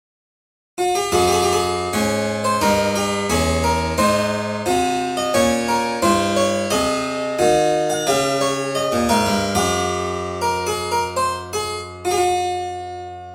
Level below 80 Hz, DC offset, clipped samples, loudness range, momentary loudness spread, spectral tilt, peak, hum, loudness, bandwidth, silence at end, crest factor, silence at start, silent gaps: -40 dBFS; under 0.1%; under 0.1%; 3 LU; 7 LU; -4 dB/octave; -4 dBFS; none; -19 LUFS; 17 kHz; 0 s; 16 dB; 0.75 s; none